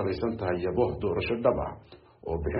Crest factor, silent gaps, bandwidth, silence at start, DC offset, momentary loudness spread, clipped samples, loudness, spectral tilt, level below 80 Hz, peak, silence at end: 20 dB; none; 5.4 kHz; 0 s; under 0.1%; 11 LU; under 0.1%; -29 LUFS; -6 dB/octave; -44 dBFS; -10 dBFS; 0 s